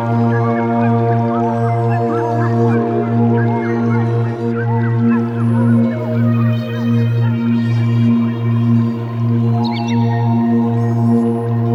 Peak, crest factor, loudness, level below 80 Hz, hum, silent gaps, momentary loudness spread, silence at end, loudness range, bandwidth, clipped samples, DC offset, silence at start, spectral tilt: -4 dBFS; 10 dB; -15 LUFS; -58 dBFS; none; none; 3 LU; 0 s; 0 LU; 6 kHz; under 0.1%; under 0.1%; 0 s; -9.5 dB/octave